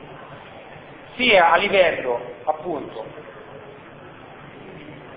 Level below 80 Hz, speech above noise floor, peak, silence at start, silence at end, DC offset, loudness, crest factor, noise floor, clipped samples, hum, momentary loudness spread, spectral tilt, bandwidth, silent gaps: -56 dBFS; 22 dB; -2 dBFS; 0 s; 0 s; under 0.1%; -19 LUFS; 20 dB; -42 dBFS; under 0.1%; none; 26 LU; -7.5 dB/octave; 5 kHz; none